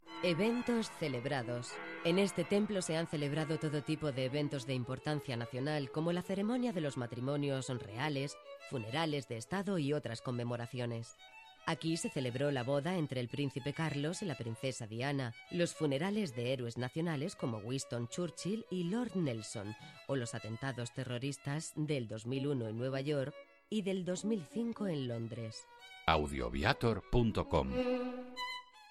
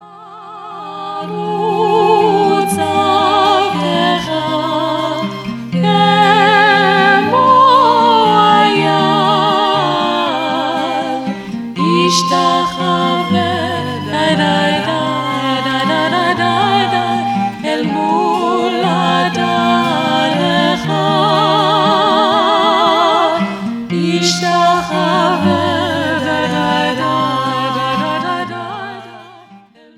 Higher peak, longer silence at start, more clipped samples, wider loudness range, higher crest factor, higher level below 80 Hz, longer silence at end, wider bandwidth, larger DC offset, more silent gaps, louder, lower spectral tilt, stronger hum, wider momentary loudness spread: second, -12 dBFS vs 0 dBFS; about the same, 0.05 s vs 0 s; neither; about the same, 4 LU vs 5 LU; first, 26 dB vs 12 dB; about the same, -56 dBFS vs -54 dBFS; second, 0 s vs 0.4 s; second, 13.5 kHz vs 15.5 kHz; neither; neither; second, -38 LUFS vs -13 LUFS; about the same, -5.5 dB/octave vs -4.5 dB/octave; neither; about the same, 8 LU vs 10 LU